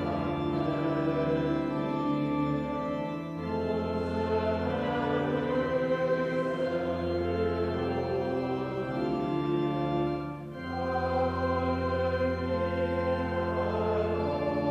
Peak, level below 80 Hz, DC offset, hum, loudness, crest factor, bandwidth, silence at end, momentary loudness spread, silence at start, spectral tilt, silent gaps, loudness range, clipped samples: -16 dBFS; -50 dBFS; under 0.1%; none; -30 LUFS; 12 dB; 8.8 kHz; 0 s; 4 LU; 0 s; -8.5 dB/octave; none; 1 LU; under 0.1%